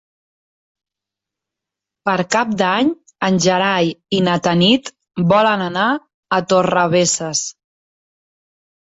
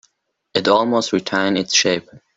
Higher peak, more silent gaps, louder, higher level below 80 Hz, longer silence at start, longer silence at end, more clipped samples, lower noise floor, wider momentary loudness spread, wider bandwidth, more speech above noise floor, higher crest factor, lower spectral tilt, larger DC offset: about the same, -2 dBFS vs -2 dBFS; first, 6.14-6.23 s vs none; about the same, -16 LUFS vs -18 LUFS; about the same, -56 dBFS vs -60 dBFS; first, 2.05 s vs 0.55 s; first, 1.3 s vs 0.2 s; neither; first, -86 dBFS vs -65 dBFS; about the same, 7 LU vs 6 LU; about the same, 8.2 kHz vs 8 kHz; first, 70 dB vs 47 dB; about the same, 16 dB vs 18 dB; about the same, -4 dB/octave vs -3 dB/octave; neither